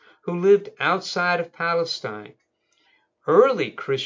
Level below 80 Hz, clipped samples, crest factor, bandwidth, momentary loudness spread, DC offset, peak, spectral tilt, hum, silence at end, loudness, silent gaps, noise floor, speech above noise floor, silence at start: -78 dBFS; under 0.1%; 20 dB; 7.6 kHz; 14 LU; under 0.1%; -2 dBFS; -5 dB/octave; none; 0 s; -21 LUFS; none; -66 dBFS; 45 dB; 0.25 s